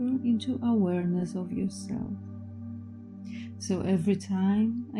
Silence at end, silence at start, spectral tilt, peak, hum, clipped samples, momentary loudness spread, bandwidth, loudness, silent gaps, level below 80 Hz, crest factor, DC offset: 0 s; 0 s; -7 dB/octave; -14 dBFS; none; under 0.1%; 15 LU; 11 kHz; -29 LUFS; none; -64 dBFS; 14 dB; under 0.1%